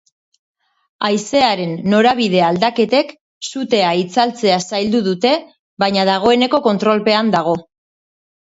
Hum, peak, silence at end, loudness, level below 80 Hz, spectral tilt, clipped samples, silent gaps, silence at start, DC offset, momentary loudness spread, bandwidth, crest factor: none; 0 dBFS; 0.85 s; -15 LUFS; -58 dBFS; -5 dB/octave; under 0.1%; 3.21-3.41 s, 5.59-5.77 s; 1 s; under 0.1%; 7 LU; 8 kHz; 16 dB